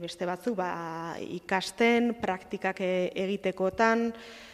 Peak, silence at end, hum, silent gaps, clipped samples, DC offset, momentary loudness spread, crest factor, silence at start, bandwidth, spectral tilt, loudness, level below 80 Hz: -10 dBFS; 0 s; none; none; under 0.1%; under 0.1%; 11 LU; 20 dB; 0 s; 14 kHz; -5 dB/octave; -29 LUFS; -64 dBFS